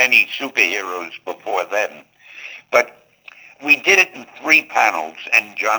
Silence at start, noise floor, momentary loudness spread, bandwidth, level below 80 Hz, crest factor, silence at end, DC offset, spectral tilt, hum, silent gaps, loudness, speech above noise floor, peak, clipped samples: 0 s; -44 dBFS; 16 LU; over 20 kHz; -74 dBFS; 18 dB; 0 s; under 0.1%; -0.5 dB/octave; none; none; -16 LUFS; 26 dB; 0 dBFS; under 0.1%